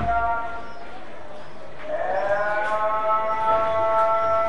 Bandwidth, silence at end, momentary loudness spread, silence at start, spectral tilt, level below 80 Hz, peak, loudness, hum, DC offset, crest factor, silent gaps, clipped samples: 10 kHz; 0 s; 20 LU; 0 s; -5.5 dB/octave; -46 dBFS; -8 dBFS; -23 LUFS; none; 4%; 14 dB; none; under 0.1%